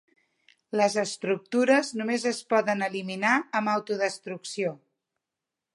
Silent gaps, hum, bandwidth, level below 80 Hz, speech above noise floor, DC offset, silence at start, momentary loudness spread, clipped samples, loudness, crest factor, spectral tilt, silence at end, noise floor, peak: none; none; 11.5 kHz; -82 dBFS; 61 dB; under 0.1%; 0.75 s; 9 LU; under 0.1%; -27 LUFS; 20 dB; -4 dB/octave; 1 s; -88 dBFS; -8 dBFS